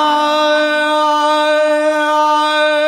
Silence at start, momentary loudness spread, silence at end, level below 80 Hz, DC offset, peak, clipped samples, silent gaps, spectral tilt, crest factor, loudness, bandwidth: 0 s; 1 LU; 0 s; -76 dBFS; under 0.1%; -2 dBFS; under 0.1%; none; -0.5 dB/octave; 10 dB; -13 LUFS; 15.5 kHz